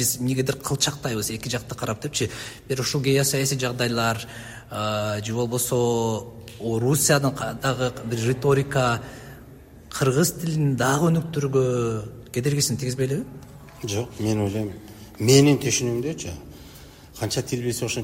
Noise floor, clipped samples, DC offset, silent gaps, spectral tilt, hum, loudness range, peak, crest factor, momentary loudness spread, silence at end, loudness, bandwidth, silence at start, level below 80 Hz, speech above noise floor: -45 dBFS; under 0.1%; under 0.1%; none; -4.5 dB/octave; none; 2 LU; -2 dBFS; 22 dB; 15 LU; 0 s; -23 LUFS; 16.5 kHz; 0 s; -50 dBFS; 22 dB